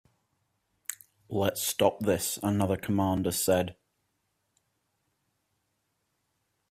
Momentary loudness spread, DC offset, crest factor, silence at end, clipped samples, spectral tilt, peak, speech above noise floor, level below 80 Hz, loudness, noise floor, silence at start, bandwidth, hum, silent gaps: 14 LU; under 0.1%; 22 dB; 3 s; under 0.1%; -4.5 dB/octave; -10 dBFS; 50 dB; -64 dBFS; -28 LUFS; -78 dBFS; 0.9 s; 16 kHz; none; none